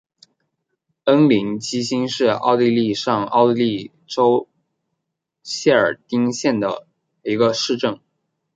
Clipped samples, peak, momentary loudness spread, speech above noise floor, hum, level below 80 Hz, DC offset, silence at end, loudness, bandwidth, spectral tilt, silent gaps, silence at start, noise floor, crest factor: under 0.1%; -2 dBFS; 9 LU; 61 dB; none; -66 dBFS; under 0.1%; 0.6 s; -19 LUFS; 9.2 kHz; -5 dB/octave; none; 1.05 s; -79 dBFS; 18 dB